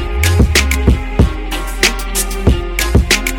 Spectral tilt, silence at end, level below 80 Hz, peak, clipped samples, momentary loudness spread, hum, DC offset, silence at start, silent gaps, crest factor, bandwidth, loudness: -4 dB/octave; 0 s; -16 dBFS; 0 dBFS; under 0.1%; 6 LU; none; under 0.1%; 0 s; none; 14 dB; 17.5 kHz; -14 LUFS